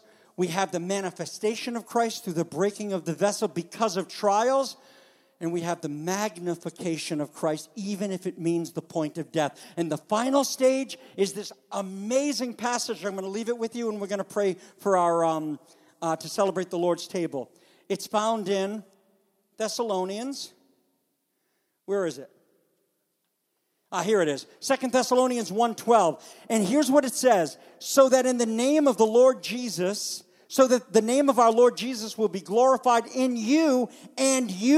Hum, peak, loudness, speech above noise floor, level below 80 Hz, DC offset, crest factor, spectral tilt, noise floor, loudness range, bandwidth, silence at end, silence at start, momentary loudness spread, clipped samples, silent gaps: none; -6 dBFS; -26 LUFS; 51 dB; -80 dBFS; under 0.1%; 20 dB; -4 dB/octave; -77 dBFS; 9 LU; 15.5 kHz; 0 s; 0.4 s; 12 LU; under 0.1%; none